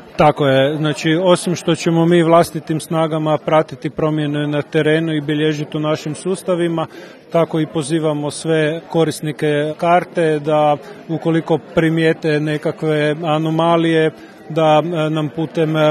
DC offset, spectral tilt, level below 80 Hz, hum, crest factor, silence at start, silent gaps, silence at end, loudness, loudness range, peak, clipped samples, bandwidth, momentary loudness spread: under 0.1%; -6 dB/octave; -54 dBFS; none; 16 dB; 0 s; none; 0 s; -17 LUFS; 3 LU; 0 dBFS; under 0.1%; 13 kHz; 7 LU